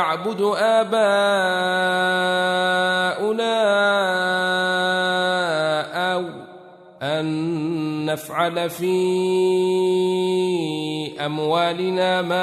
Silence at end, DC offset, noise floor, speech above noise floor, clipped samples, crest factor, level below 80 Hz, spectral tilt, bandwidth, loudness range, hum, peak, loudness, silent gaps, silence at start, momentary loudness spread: 0 s; under 0.1%; -44 dBFS; 24 dB; under 0.1%; 14 dB; -72 dBFS; -4.5 dB/octave; 13.5 kHz; 5 LU; none; -6 dBFS; -20 LUFS; none; 0 s; 7 LU